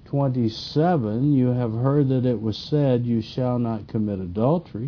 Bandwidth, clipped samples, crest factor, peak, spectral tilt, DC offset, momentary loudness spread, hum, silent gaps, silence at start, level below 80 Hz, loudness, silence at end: 5.4 kHz; under 0.1%; 14 dB; -8 dBFS; -9 dB/octave; under 0.1%; 6 LU; none; none; 0.05 s; -52 dBFS; -23 LUFS; 0 s